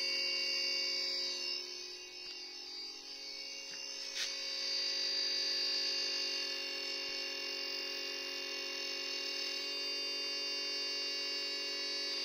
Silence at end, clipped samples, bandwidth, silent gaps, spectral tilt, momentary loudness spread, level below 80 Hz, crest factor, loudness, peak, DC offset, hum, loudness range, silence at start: 0 s; under 0.1%; 16 kHz; none; 2 dB/octave; 11 LU; -80 dBFS; 14 dB; -36 LUFS; -24 dBFS; under 0.1%; none; 5 LU; 0 s